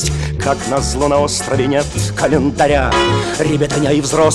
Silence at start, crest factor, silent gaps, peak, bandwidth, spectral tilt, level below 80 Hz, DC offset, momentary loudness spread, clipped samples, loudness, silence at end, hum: 0 s; 14 dB; none; -2 dBFS; 13 kHz; -4.5 dB/octave; -28 dBFS; under 0.1%; 5 LU; under 0.1%; -15 LUFS; 0 s; none